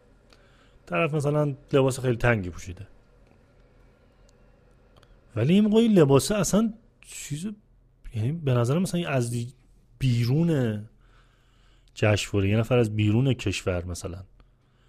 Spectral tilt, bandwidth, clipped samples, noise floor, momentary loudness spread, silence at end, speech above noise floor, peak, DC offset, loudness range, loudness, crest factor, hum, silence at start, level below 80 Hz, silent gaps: -6 dB/octave; 15.5 kHz; under 0.1%; -58 dBFS; 18 LU; 0.65 s; 35 dB; -6 dBFS; under 0.1%; 5 LU; -24 LUFS; 20 dB; none; 0.85 s; -48 dBFS; none